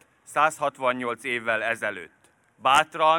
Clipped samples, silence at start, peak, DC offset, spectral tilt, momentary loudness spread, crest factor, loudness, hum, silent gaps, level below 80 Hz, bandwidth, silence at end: under 0.1%; 0.3 s; -4 dBFS; under 0.1%; -2.5 dB/octave; 9 LU; 20 dB; -24 LUFS; none; none; -68 dBFS; 17.5 kHz; 0 s